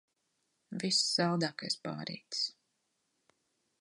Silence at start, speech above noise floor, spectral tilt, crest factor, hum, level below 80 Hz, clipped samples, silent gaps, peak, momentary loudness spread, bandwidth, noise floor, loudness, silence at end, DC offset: 0.7 s; 46 dB; -3.5 dB/octave; 20 dB; none; -82 dBFS; under 0.1%; none; -18 dBFS; 12 LU; 11.5 kHz; -81 dBFS; -33 LUFS; 1.3 s; under 0.1%